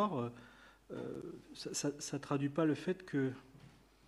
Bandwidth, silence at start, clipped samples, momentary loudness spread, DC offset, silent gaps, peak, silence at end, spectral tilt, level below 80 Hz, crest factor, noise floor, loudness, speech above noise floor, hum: 13 kHz; 0 s; under 0.1%; 16 LU; under 0.1%; none; -22 dBFS; 0.3 s; -5.5 dB/octave; -72 dBFS; 18 dB; -62 dBFS; -39 LUFS; 23 dB; none